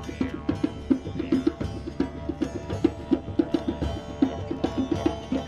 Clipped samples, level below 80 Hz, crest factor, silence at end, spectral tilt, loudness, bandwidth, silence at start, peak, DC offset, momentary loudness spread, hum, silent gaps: under 0.1%; -42 dBFS; 18 dB; 0 s; -7.5 dB/octave; -28 LUFS; 10.5 kHz; 0 s; -8 dBFS; 0.1%; 6 LU; none; none